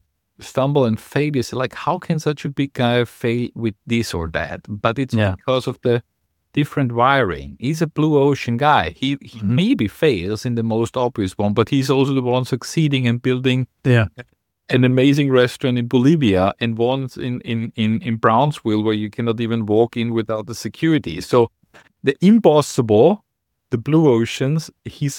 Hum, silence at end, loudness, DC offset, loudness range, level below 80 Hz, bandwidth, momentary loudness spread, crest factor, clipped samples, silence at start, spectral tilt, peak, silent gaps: none; 0 s; -19 LUFS; under 0.1%; 4 LU; -48 dBFS; 17 kHz; 9 LU; 18 dB; under 0.1%; 0.4 s; -6.5 dB/octave; 0 dBFS; none